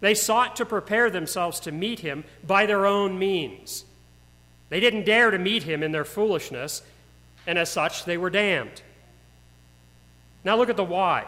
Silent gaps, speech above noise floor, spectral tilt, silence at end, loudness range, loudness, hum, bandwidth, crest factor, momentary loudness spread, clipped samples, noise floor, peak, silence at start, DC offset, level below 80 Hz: none; 30 dB; -3 dB/octave; 0 s; 4 LU; -24 LUFS; 60 Hz at -55 dBFS; 16 kHz; 20 dB; 13 LU; under 0.1%; -54 dBFS; -6 dBFS; 0 s; under 0.1%; -58 dBFS